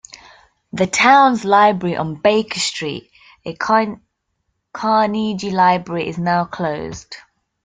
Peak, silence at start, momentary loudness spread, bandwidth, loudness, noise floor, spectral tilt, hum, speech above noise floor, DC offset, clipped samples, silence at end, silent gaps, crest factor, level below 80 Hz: -2 dBFS; 0.15 s; 20 LU; 9.6 kHz; -17 LUFS; -71 dBFS; -4.5 dB/octave; none; 55 dB; under 0.1%; under 0.1%; 0.45 s; none; 16 dB; -56 dBFS